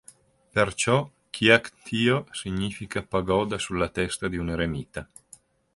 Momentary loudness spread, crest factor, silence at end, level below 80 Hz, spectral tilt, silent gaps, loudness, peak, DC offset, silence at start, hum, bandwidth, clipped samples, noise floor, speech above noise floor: 13 LU; 24 dB; 0.7 s; -48 dBFS; -4.5 dB/octave; none; -25 LUFS; -2 dBFS; under 0.1%; 0.55 s; none; 11.5 kHz; under 0.1%; -55 dBFS; 30 dB